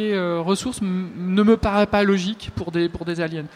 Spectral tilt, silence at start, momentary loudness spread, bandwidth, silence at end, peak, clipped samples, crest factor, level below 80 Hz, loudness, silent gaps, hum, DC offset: -6 dB/octave; 0 s; 9 LU; 13.5 kHz; 0.1 s; -6 dBFS; under 0.1%; 16 dB; -42 dBFS; -21 LUFS; none; none; under 0.1%